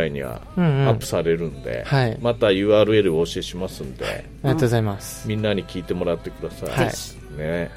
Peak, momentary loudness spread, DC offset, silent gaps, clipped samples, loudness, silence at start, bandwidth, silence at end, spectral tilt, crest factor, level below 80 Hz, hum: -4 dBFS; 13 LU; under 0.1%; none; under 0.1%; -22 LUFS; 0 s; 16 kHz; 0 s; -6 dB/octave; 18 dB; -42 dBFS; none